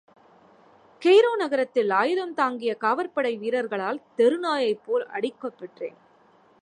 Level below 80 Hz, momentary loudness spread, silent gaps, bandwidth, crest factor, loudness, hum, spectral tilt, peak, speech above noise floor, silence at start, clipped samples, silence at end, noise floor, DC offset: -82 dBFS; 17 LU; none; 10.5 kHz; 18 dB; -24 LUFS; none; -4.5 dB/octave; -8 dBFS; 34 dB; 1 s; under 0.1%; 0.7 s; -58 dBFS; under 0.1%